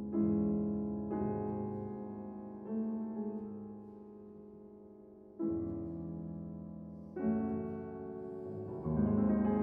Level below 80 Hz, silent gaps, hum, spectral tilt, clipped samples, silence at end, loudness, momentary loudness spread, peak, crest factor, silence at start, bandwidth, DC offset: -58 dBFS; none; none; -13 dB/octave; under 0.1%; 0 s; -38 LUFS; 20 LU; -20 dBFS; 16 dB; 0 s; 2.8 kHz; under 0.1%